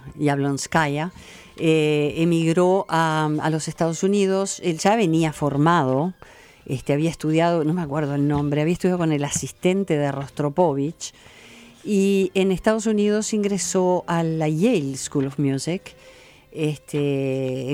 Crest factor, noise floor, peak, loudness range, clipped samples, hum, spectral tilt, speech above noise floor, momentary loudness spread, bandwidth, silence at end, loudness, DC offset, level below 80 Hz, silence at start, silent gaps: 16 dB; -46 dBFS; -6 dBFS; 3 LU; under 0.1%; none; -5.5 dB/octave; 25 dB; 7 LU; 16 kHz; 0 s; -22 LUFS; under 0.1%; -52 dBFS; 0 s; none